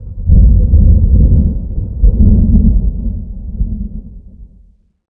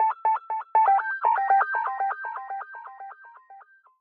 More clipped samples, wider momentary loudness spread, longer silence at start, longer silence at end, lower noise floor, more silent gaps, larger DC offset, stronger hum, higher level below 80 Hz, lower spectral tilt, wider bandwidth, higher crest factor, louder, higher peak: neither; second, 15 LU vs 19 LU; about the same, 0 s vs 0 s; first, 0.7 s vs 0.4 s; second, -46 dBFS vs -51 dBFS; neither; neither; neither; first, -12 dBFS vs under -90 dBFS; first, -17 dB/octave vs -2 dB/octave; second, 1 kHz vs 4.2 kHz; second, 10 dB vs 16 dB; first, -12 LUFS vs -24 LUFS; first, 0 dBFS vs -10 dBFS